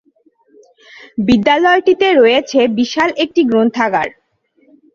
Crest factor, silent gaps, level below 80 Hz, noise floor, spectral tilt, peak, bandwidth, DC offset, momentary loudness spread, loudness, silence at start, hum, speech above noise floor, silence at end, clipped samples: 14 dB; none; -50 dBFS; -56 dBFS; -5 dB/octave; 0 dBFS; 7.4 kHz; under 0.1%; 8 LU; -13 LUFS; 1.15 s; none; 43 dB; 0.85 s; under 0.1%